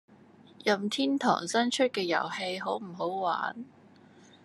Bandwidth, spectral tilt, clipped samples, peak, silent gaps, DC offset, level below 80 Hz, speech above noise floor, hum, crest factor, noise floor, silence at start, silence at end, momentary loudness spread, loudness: 12.5 kHz; -3.5 dB/octave; under 0.1%; -10 dBFS; none; under 0.1%; -84 dBFS; 27 dB; none; 20 dB; -56 dBFS; 0.6 s; 0.75 s; 8 LU; -30 LUFS